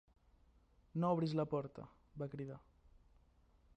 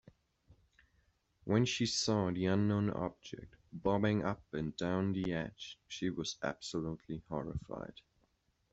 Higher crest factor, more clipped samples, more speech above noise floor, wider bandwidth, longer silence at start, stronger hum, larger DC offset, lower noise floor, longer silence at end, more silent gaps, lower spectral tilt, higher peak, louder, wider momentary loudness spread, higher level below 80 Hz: about the same, 20 dB vs 20 dB; neither; second, 31 dB vs 41 dB; about the same, 8.4 kHz vs 8.2 kHz; first, 0.95 s vs 0.5 s; neither; neither; second, -71 dBFS vs -77 dBFS; about the same, 0.8 s vs 0.8 s; neither; first, -9 dB/octave vs -5.5 dB/octave; second, -24 dBFS vs -18 dBFS; second, -41 LUFS vs -36 LUFS; first, 20 LU vs 15 LU; second, -70 dBFS vs -62 dBFS